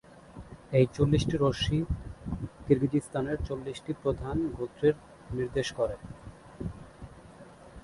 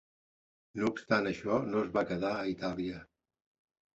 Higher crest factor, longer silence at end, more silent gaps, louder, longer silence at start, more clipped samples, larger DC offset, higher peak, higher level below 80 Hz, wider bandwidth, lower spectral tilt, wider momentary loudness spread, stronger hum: about the same, 20 dB vs 20 dB; second, 0.05 s vs 0.9 s; neither; first, -30 LUFS vs -33 LUFS; second, 0.1 s vs 0.75 s; neither; neither; first, -10 dBFS vs -14 dBFS; first, -44 dBFS vs -64 dBFS; first, 11.5 kHz vs 8 kHz; first, -7 dB/octave vs -5 dB/octave; first, 23 LU vs 9 LU; neither